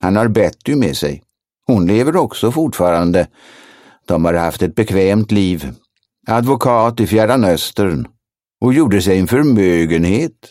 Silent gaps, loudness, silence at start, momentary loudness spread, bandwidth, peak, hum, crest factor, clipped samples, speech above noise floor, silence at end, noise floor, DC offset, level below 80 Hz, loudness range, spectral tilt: none; -14 LUFS; 0 s; 8 LU; 16.5 kHz; 0 dBFS; none; 14 dB; under 0.1%; 22 dB; 0.2 s; -35 dBFS; under 0.1%; -40 dBFS; 3 LU; -6.5 dB/octave